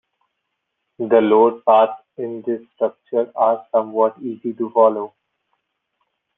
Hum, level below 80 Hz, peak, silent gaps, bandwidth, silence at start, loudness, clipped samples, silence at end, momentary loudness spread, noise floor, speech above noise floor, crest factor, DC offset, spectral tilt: none; -70 dBFS; -2 dBFS; none; 3.9 kHz; 1 s; -18 LUFS; under 0.1%; 1.3 s; 14 LU; -76 dBFS; 58 dB; 18 dB; under 0.1%; -9 dB/octave